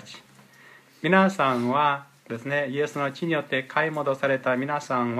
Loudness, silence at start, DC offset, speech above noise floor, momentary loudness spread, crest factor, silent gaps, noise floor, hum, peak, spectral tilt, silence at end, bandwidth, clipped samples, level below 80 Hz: -24 LUFS; 0.05 s; under 0.1%; 28 dB; 10 LU; 18 dB; none; -52 dBFS; none; -8 dBFS; -6 dB/octave; 0 s; 14.5 kHz; under 0.1%; -74 dBFS